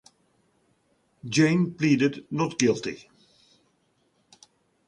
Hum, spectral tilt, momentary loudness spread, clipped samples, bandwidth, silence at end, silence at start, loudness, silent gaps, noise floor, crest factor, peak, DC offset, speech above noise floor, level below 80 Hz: none; -5.5 dB/octave; 14 LU; under 0.1%; 11 kHz; 1.9 s; 1.25 s; -24 LUFS; none; -69 dBFS; 22 dB; -6 dBFS; under 0.1%; 45 dB; -66 dBFS